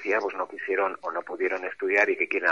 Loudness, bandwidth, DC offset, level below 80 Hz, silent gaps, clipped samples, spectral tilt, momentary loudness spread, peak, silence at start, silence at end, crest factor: -26 LUFS; 7.2 kHz; 0.1%; -76 dBFS; none; under 0.1%; -4 dB/octave; 10 LU; -8 dBFS; 0 s; 0 s; 18 dB